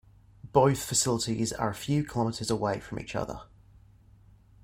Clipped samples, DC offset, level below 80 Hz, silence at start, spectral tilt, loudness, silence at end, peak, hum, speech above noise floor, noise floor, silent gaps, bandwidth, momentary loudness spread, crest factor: under 0.1%; under 0.1%; -54 dBFS; 0.45 s; -4.5 dB/octave; -29 LUFS; 1.2 s; -8 dBFS; none; 29 dB; -57 dBFS; none; 16.5 kHz; 11 LU; 22 dB